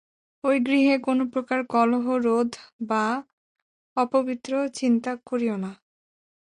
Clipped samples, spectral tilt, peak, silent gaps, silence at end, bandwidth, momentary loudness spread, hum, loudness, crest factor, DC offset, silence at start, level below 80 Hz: under 0.1%; -5.5 dB/octave; -10 dBFS; 2.73-2.79 s, 3.33-3.55 s, 3.62-3.96 s; 0.85 s; 11 kHz; 9 LU; none; -24 LUFS; 16 dB; under 0.1%; 0.45 s; -70 dBFS